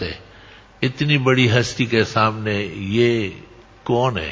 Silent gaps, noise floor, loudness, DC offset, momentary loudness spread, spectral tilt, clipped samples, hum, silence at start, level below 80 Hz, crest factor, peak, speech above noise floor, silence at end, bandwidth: none; -45 dBFS; -19 LUFS; under 0.1%; 12 LU; -6 dB/octave; under 0.1%; none; 0 s; -44 dBFS; 18 dB; 0 dBFS; 26 dB; 0 s; 7.8 kHz